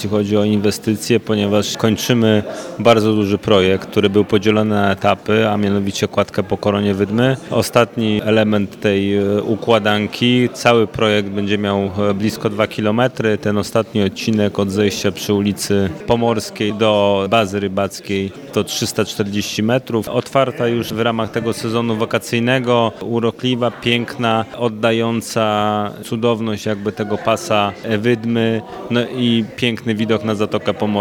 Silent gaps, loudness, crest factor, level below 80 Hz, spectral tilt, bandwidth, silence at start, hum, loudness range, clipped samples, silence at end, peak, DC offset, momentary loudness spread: none; -17 LUFS; 16 dB; -52 dBFS; -5.5 dB/octave; 18 kHz; 0 s; none; 3 LU; under 0.1%; 0 s; 0 dBFS; under 0.1%; 5 LU